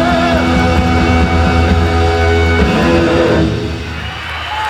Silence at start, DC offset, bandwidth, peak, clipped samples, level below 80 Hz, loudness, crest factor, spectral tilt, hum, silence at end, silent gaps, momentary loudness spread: 0 s; under 0.1%; 11.5 kHz; 0 dBFS; under 0.1%; -20 dBFS; -12 LUFS; 12 dB; -6.5 dB/octave; none; 0 s; none; 10 LU